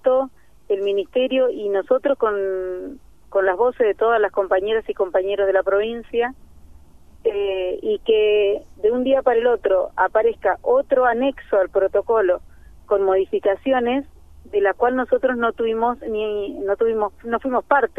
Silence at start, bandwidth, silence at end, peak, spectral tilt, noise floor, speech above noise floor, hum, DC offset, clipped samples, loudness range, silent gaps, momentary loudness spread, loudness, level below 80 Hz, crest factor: 0.05 s; 3.8 kHz; 0.1 s; -2 dBFS; -6 dB/octave; -47 dBFS; 28 dB; none; 0.4%; under 0.1%; 3 LU; none; 7 LU; -20 LUFS; -50 dBFS; 18 dB